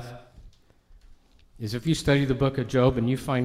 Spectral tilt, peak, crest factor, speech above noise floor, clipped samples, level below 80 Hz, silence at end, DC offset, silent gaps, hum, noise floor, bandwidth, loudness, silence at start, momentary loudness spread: -6.5 dB/octave; -8 dBFS; 18 dB; 31 dB; under 0.1%; -46 dBFS; 0 s; under 0.1%; none; none; -55 dBFS; 14.5 kHz; -25 LUFS; 0 s; 12 LU